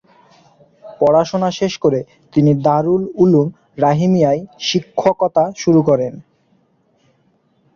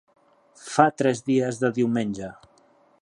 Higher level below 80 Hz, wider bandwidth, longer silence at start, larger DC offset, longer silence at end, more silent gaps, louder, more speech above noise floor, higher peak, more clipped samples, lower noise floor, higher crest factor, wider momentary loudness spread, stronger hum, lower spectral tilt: first, -54 dBFS vs -64 dBFS; second, 7.2 kHz vs 11.5 kHz; first, 0.85 s vs 0.6 s; neither; first, 1.55 s vs 0.7 s; neither; first, -16 LUFS vs -23 LUFS; first, 44 dB vs 37 dB; about the same, -2 dBFS vs -2 dBFS; neither; about the same, -59 dBFS vs -59 dBFS; second, 14 dB vs 24 dB; second, 6 LU vs 15 LU; neither; about the same, -7 dB/octave vs -6 dB/octave